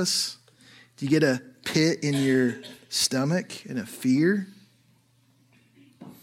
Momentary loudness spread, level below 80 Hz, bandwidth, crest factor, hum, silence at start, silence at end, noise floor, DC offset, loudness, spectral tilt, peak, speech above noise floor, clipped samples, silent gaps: 12 LU; -70 dBFS; 16.5 kHz; 20 dB; none; 0 s; 0.1 s; -63 dBFS; under 0.1%; -25 LUFS; -4.5 dB/octave; -8 dBFS; 38 dB; under 0.1%; none